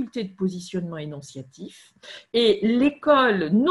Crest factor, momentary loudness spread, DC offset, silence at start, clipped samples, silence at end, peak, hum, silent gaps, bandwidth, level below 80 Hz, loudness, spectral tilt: 16 dB; 23 LU; under 0.1%; 0 s; under 0.1%; 0 s; -6 dBFS; none; none; 11.5 kHz; -62 dBFS; -22 LUFS; -6 dB/octave